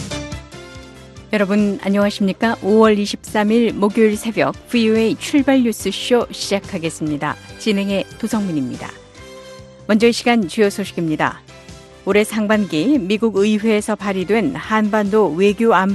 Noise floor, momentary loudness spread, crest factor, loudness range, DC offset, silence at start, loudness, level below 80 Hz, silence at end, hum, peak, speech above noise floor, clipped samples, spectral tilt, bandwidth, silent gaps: -39 dBFS; 13 LU; 16 dB; 4 LU; under 0.1%; 0 s; -17 LUFS; -46 dBFS; 0 s; none; 0 dBFS; 23 dB; under 0.1%; -5.5 dB/octave; 12.5 kHz; none